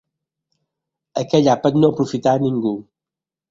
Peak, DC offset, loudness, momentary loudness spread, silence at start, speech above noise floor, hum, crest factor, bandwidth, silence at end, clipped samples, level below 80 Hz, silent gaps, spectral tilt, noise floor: -2 dBFS; under 0.1%; -18 LUFS; 12 LU; 1.15 s; 71 dB; none; 18 dB; 7.6 kHz; 0.7 s; under 0.1%; -58 dBFS; none; -7 dB/octave; -88 dBFS